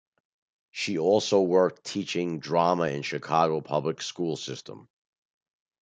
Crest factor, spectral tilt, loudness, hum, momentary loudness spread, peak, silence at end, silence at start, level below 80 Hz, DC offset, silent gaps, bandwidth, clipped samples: 20 dB; -5 dB/octave; -26 LUFS; none; 12 LU; -8 dBFS; 1.05 s; 0.75 s; -70 dBFS; under 0.1%; none; 9.2 kHz; under 0.1%